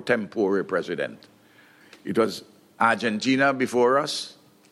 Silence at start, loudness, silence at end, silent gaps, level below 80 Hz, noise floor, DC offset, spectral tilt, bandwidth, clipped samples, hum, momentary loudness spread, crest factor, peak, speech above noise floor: 0 s; -24 LUFS; 0.4 s; none; -74 dBFS; -55 dBFS; under 0.1%; -4.5 dB/octave; 15 kHz; under 0.1%; none; 11 LU; 20 dB; -6 dBFS; 31 dB